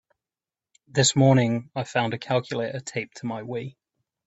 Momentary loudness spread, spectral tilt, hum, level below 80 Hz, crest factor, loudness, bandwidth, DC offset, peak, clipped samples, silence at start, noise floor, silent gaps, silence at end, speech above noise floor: 14 LU; -4.5 dB/octave; none; -62 dBFS; 20 dB; -24 LUFS; 8.2 kHz; under 0.1%; -6 dBFS; under 0.1%; 0.95 s; under -90 dBFS; none; 0.55 s; over 66 dB